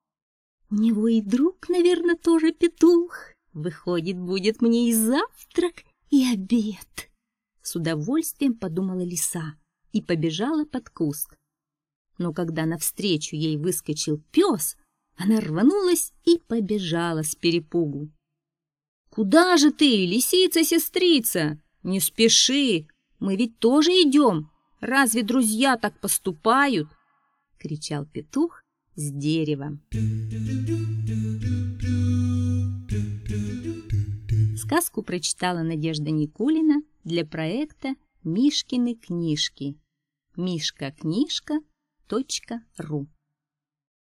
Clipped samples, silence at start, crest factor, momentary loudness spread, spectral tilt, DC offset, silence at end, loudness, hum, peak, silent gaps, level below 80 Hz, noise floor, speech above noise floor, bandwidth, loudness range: under 0.1%; 0.7 s; 22 dB; 13 LU; -4.5 dB/octave; under 0.1%; 1.1 s; -23 LUFS; none; -2 dBFS; 11.95-12.05 s, 18.88-19.05 s; -50 dBFS; -89 dBFS; 66 dB; 16.5 kHz; 8 LU